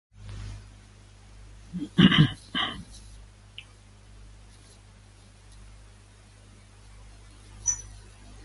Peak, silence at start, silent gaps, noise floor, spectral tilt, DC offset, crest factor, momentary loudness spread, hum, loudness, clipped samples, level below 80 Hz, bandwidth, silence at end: -4 dBFS; 0.2 s; none; -52 dBFS; -4 dB/octave; under 0.1%; 26 dB; 30 LU; 50 Hz at -50 dBFS; -24 LUFS; under 0.1%; -50 dBFS; 11.5 kHz; 0.6 s